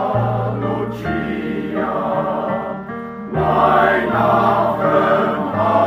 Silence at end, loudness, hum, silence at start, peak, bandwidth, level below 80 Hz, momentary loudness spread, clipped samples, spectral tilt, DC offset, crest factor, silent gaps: 0 s; -18 LUFS; none; 0 s; 0 dBFS; 15 kHz; -46 dBFS; 9 LU; under 0.1%; -8 dB/octave; under 0.1%; 16 dB; none